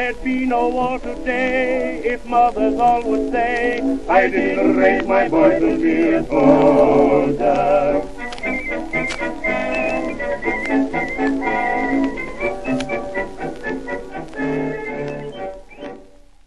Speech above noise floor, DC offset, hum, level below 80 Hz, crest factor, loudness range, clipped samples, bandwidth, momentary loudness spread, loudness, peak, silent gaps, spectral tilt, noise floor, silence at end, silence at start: 30 dB; 2%; none; -38 dBFS; 18 dB; 10 LU; under 0.1%; 11 kHz; 13 LU; -18 LUFS; 0 dBFS; none; -6.5 dB/octave; -46 dBFS; 0 s; 0 s